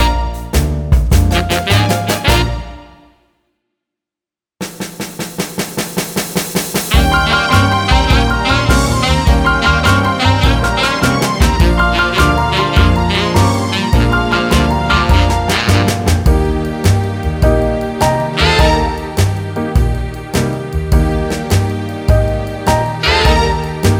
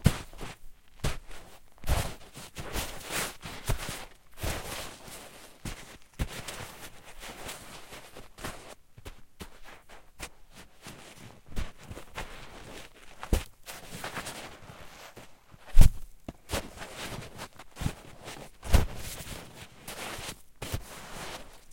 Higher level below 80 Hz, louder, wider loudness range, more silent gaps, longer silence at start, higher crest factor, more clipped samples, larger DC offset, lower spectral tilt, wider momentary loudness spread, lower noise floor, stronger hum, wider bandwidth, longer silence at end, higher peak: first, -18 dBFS vs -34 dBFS; first, -13 LUFS vs -37 LUFS; second, 7 LU vs 12 LU; neither; about the same, 0 s vs 0 s; second, 12 dB vs 28 dB; neither; second, under 0.1% vs 0.1%; about the same, -5 dB/octave vs -4.5 dB/octave; second, 8 LU vs 17 LU; first, -88 dBFS vs -52 dBFS; neither; first, over 20 kHz vs 16.5 kHz; about the same, 0 s vs 0 s; first, 0 dBFS vs -4 dBFS